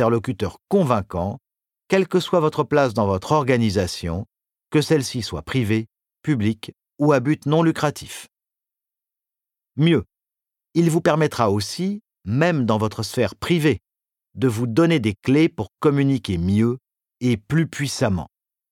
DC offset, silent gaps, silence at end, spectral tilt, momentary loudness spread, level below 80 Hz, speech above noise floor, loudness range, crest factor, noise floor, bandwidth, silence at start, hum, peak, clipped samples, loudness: under 0.1%; none; 0.45 s; -6.5 dB/octave; 10 LU; -50 dBFS; 69 dB; 3 LU; 18 dB; -89 dBFS; 16 kHz; 0 s; none; -4 dBFS; under 0.1%; -21 LUFS